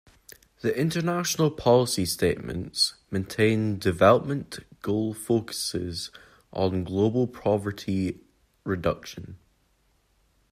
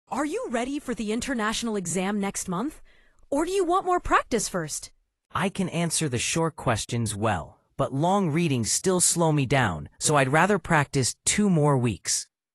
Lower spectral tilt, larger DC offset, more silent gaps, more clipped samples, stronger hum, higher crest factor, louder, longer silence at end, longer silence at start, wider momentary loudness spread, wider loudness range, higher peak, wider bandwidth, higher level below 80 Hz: about the same, -5 dB/octave vs -4 dB/octave; neither; neither; neither; neither; about the same, 22 dB vs 20 dB; about the same, -26 LUFS vs -25 LUFS; first, 1.15 s vs 0.3 s; first, 0.65 s vs 0.1 s; first, 14 LU vs 10 LU; about the same, 5 LU vs 5 LU; about the same, -4 dBFS vs -6 dBFS; first, 15.5 kHz vs 13.5 kHz; second, -56 dBFS vs -48 dBFS